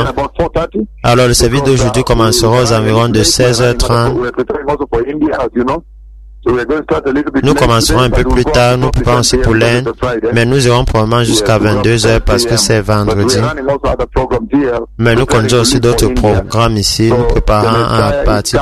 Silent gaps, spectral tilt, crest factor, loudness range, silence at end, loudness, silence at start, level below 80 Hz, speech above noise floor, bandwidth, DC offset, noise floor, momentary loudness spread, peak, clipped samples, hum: none; -5 dB/octave; 10 dB; 3 LU; 0 s; -11 LUFS; 0 s; -22 dBFS; 23 dB; 13.5 kHz; under 0.1%; -33 dBFS; 6 LU; 0 dBFS; under 0.1%; none